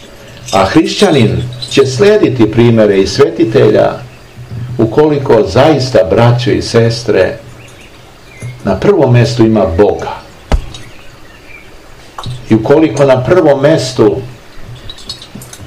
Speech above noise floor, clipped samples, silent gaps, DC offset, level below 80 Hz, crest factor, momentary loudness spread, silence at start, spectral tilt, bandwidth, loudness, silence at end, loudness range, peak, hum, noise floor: 27 dB; 3%; none; 0.7%; -28 dBFS; 10 dB; 19 LU; 0 s; -6.5 dB/octave; 12.5 kHz; -9 LUFS; 0 s; 4 LU; 0 dBFS; none; -35 dBFS